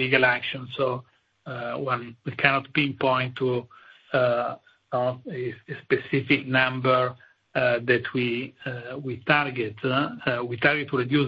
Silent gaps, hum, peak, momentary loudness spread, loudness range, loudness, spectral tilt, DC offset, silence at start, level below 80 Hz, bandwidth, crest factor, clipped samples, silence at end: none; none; 0 dBFS; 12 LU; 2 LU; -25 LUFS; -8.5 dB/octave; under 0.1%; 0 s; -64 dBFS; 5.4 kHz; 24 dB; under 0.1%; 0 s